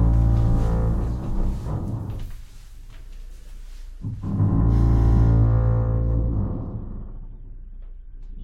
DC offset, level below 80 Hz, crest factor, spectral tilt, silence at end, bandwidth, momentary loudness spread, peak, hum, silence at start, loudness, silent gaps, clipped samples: under 0.1%; -24 dBFS; 16 dB; -10 dB/octave; 0 s; 4.2 kHz; 25 LU; -6 dBFS; none; 0 s; -23 LUFS; none; under 0.1%